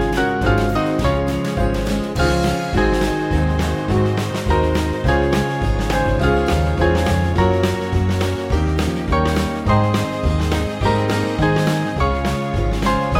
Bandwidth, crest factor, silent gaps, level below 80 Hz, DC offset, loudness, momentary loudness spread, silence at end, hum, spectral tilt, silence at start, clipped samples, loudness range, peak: 16.5 kHz; 14 dB; none; -24 dBFS; under 0.1%; -19 LUFS; 3 LU; 0 s; none; -6.5 dB/octave; 0 s; under 0.1%; 1 LU; -4 dBFS